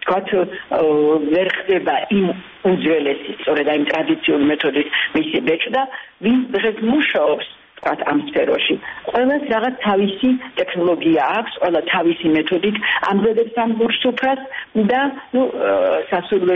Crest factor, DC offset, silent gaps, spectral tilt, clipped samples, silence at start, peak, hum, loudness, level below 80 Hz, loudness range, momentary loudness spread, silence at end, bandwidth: 12 dB; under 0.1%; none; -7.5 dB/octave; under 0.1%; 0 s; -6 dBFS; none; -18 LUFS; -56 dBFS; 1 LU; 5 LU; 0 s; 6 kHz